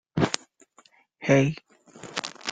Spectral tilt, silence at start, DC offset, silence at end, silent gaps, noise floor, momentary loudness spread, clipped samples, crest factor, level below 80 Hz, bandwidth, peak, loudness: -5 dB/octave; 0.15 s; under 0.1%; 0 s; none; -60 dBFS; 17 LU; under 0.1%; 26 dB; -60 dBFS; 9.4 kHz; -2 dBFS; -26 LUFS